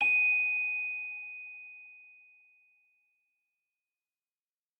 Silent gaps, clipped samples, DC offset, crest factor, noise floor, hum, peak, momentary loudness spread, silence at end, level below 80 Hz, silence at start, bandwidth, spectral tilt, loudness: none; under 0.1%; under 0.1%; 16 dB; under -90 dBFS; none; -18 dBFS; 24 LU; 2.75 s; under -90 dBFS; 0 s; 8 kHz; 2.5 dB/octave; -28 LUFS